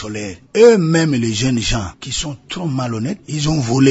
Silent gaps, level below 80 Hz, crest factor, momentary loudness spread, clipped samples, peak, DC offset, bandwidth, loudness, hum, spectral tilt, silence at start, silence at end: none; -36 dBFS; 16 dB; 14 LU; under 0.1%; 0 dBFS; under 0.1%; 8 kHz; -17 LUFS; none; -5.5 dB/octave; 0 s; 0 s